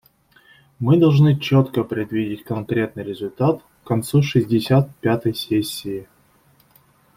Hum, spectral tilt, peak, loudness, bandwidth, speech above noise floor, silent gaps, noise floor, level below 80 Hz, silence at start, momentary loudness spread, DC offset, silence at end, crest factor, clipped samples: none; -7 dB/octave; -4 dBFS; -20 LUFS; 16 kHz; 38 dB; none; -57 dBFS; -54 dBFS; 0.8 s; 13 LU; under 0.1%; 1.15 s; 16 dB; under 0.1%